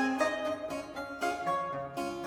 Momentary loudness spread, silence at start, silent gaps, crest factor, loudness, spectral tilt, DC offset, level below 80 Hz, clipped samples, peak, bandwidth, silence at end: 8 LU; 0 s; none; 16 dB; -34 LUFS; -4.5 dB/octave; under 0.1%; -64 dBFS; under 0.1%; -18 dBFS; 17.5 kHz; 0 s